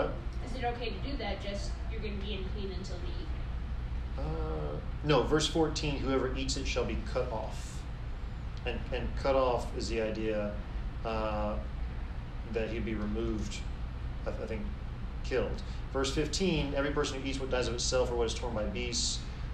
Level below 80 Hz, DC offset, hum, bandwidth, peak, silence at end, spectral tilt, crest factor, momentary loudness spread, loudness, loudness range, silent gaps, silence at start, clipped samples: -38 dBFS; under 0.1%; none; 10 kHz; -14 dBFS; 0 s; -5 dB/octave; 18 dB; 11 LU; -34 LUFS; 6 LU; none; 0 s; under 0.1%